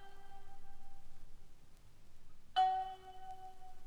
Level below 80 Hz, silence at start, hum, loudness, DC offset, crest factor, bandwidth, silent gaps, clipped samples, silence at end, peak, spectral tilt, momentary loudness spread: -54 dBFS; 0 s; none; -39 LUFS; under 0.1%; 18 dB; 8.8 kHz; none; under 0.1%; 0 s; -22 dBFS; -3 dB/octave; 28 LU